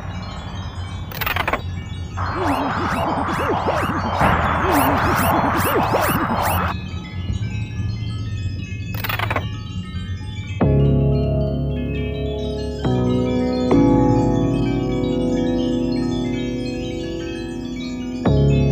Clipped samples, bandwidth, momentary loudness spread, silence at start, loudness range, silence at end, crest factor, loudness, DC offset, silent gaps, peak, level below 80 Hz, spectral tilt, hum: under 0.1%; 16 kHz; 12 LU; 0 s; 6 LU; 0 s; 18 dB; -21 LUFS; under 0.1%; none; -2 dBFS; -32 dBFS; -6.5 dB/octave; none